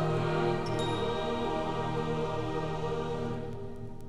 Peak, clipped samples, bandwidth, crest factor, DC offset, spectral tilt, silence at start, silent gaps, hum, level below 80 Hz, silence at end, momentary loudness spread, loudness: -18 dBFS; under 0.1%; 12 kHz; 14 dB; under 0.1%; -6.5 dB/octave; 0 s; none; none; -46 dBFS; 0 s; 8 LU; -33 LUFS